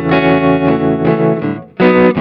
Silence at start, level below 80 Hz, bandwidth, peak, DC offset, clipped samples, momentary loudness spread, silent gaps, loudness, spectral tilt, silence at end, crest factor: 0 s; -40 dBFS; 5.4 kHz; 0 dBFS; under 0.1%; under 0.1%; 6 LU; none; -12 LUFS; -10 dB/octave; 0 s; 12 dB